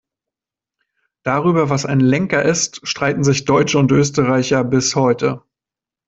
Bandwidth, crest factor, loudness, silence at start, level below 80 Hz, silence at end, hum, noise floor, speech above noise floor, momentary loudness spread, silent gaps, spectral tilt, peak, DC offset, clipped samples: 8 kHz; 16 dB; -16 LUFS; 1.25 s; -50 dBFS; 0.7 s; none; -88 dBFS; 73 dB; 6 LU; none; -5 dB/octave; -2 dBFS; under 0.1%; under 0.1%